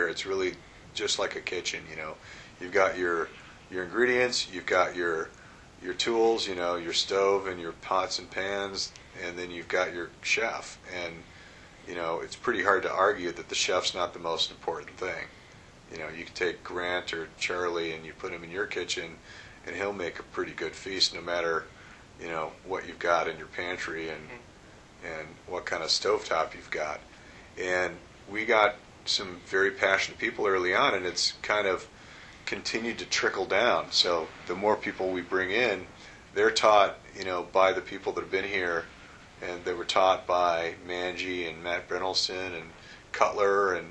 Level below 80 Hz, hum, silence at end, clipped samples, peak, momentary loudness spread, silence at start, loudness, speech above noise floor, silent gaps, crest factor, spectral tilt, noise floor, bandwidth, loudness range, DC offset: -60 dBFS; none; 0 s; under 0.1%; -6 dBFS; 15 LU; 0 s; -29 LUFS; 23 dB; none; 24 dB; -2.5 dB/octave; -52 dBFS; 10.5 kHz; 7 LU; under 0.1%